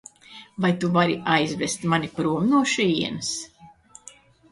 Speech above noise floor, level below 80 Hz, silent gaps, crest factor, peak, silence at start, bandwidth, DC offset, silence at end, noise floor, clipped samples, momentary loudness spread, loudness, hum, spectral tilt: 27 dB; -60 dBFS; none; 20 dB; -4 dBFS; 0.3 s; 11.5 kHz; under 0.1%; 0.85 s; -50 dBFS; under 0.1%; 17 LU; -23 LUFS; none; -4.5 dB/octave